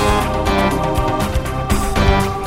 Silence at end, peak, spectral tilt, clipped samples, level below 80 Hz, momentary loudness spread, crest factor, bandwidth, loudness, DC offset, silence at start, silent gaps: 0 s; 0 dBFS; -5.5 dB/octave; under 0.1%; -22 dBFS; 4 LU; 16 dB; 16.5 kHz; -17 LUFS; under 0.1%; 0 s; none